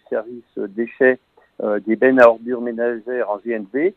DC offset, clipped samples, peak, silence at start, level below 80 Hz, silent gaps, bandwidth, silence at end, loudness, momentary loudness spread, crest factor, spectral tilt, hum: under 0.1%; under 0.1%; 0 dBFS; 0.1 s; -70 dBFS; none; 6 kHz; 0.05 s; -18 LUFS; 15 LU; 18 dB; -7.5 dB/octave; none